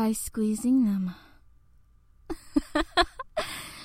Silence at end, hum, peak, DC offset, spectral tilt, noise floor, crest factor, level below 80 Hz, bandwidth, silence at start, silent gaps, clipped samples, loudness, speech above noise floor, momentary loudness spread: 0 s; none; -10 dBFS; under 0.1%; -4.5 dB/octave; -58 dBFS; 20 dB; -46 dBFS; 16.5 kHz; 0 s; none; under 0.1%; -28 LUFS; 32 dB; 14 LU